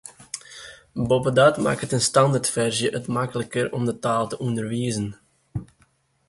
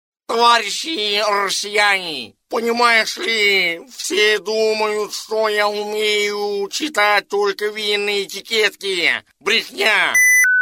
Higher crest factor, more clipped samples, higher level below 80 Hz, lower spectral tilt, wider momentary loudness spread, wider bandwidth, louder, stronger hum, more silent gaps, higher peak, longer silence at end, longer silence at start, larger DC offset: about the same, 20 dB vs 16 dB; neither; first, -54 dBFS vs -70 dBFS; first, -4.5 dB/octave vs -0.5 dB/octave; first, 18 LU vs 8 LU; second, 11.5 kHz vs 17 kHz; second, -22 LUFS vs -16 LUFS; neither; neither; about the same, -4 dBFS vs -2 dBFS; first, 0.65 s vs 0 s; second, 0.05 s vs 0.3 s; neither